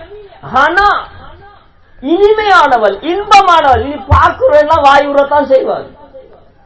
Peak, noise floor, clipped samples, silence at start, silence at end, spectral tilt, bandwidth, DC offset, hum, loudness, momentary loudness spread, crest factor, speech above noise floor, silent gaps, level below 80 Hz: 0 dBFS; -41 dBFS; 3%; 0 s; 0.45 s; -5.5 dB/octave; 8 kHz; 0.4%; none; -9 LUFS; 9 LU; 10 dB; 33 dB; none; -28 dBFS